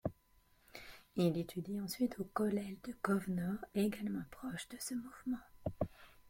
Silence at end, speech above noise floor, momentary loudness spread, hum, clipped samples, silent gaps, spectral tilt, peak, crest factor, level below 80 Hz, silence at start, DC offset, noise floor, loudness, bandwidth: 0 s; 32 dB; 10 LU; none; under 0.1%; none; -6 dB/octave; -18 dBFS; 22 dB; -64 dBFS; 0.05 s; under 0.1%; -71 dBFS; -40 LUFS; 16.5 kHz